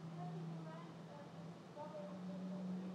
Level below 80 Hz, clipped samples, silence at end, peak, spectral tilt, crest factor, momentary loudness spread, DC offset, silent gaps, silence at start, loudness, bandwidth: under -90 dBFS; under 0.1%; 0 s; -38 dBFS; -8 dB/octave; 12 dB; 8 LU; under 0.1%; none; 0 s; -50 LUFS; 10 kHz